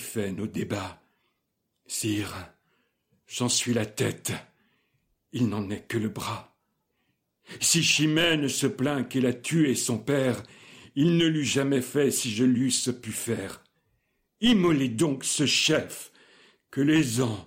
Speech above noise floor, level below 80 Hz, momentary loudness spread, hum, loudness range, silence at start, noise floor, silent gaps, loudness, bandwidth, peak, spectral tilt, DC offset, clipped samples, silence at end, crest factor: 53 dB; -62 dBFS; 14 LU; none; 8 LU; 0 s; -79 dBFS; none; -25 LUFS; 16.5 kHz; -10 dBFS; -4 dB/octave; under 0.1%; under 0.1%; 0.05 s; 16 dB